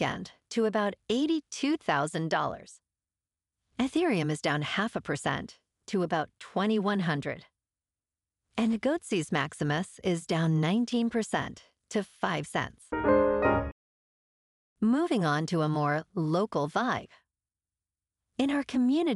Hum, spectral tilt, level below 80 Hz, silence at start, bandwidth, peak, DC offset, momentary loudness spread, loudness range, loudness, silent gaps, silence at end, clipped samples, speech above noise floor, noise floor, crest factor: none; -6 dB/octave; -56 dBFS; 0 s; 12 kHz; -12 dBFS; under 0.1%; 9 LU; 3 LU; -29 LUFS; 13.72-14.76 s; 0 s; under 0.1%; over 61 dB; under -90 dBFS; 18 dB